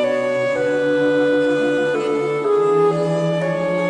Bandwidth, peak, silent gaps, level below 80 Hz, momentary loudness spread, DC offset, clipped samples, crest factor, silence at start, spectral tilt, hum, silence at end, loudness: 10.5 kHz; -6 dBFS; none; -58 dBFS; 4 LU; under 0.1%; under 0.1%; 10 dB; 0 s; -6.5 dB/octave; none; 0 s; -18 LUFS